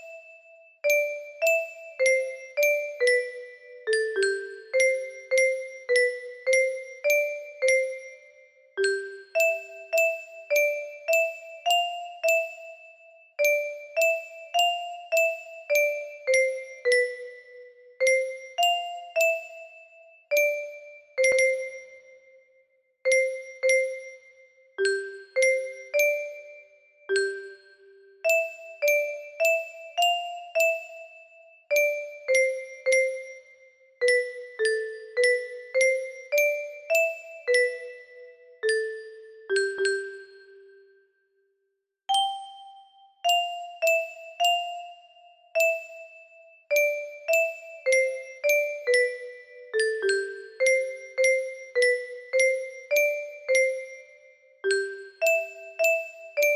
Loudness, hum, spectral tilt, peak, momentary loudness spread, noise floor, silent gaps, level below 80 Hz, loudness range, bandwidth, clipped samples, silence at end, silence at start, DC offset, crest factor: -25 LUFS; none; 0.5 dB/octave; -10 dBFS; 15 LU; -79 dBFS; none; -78 dBFS; 3 LU; 15.5 kHz; under 0.1%; 0 s; 0 s; under 0.1%; 16 dB